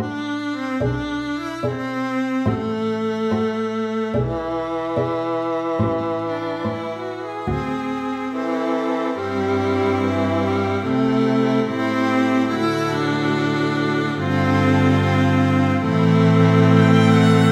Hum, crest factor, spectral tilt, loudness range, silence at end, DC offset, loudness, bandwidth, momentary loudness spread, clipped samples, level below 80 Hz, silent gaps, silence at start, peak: none; 18 dB; -7.5 dB/octave; 7 LU; 0 s; under 0.1%; -20 LUFS; 12 kHz; 11 LU; under 0.1%; -46 dBFS; none; 0 s; -2 dBFS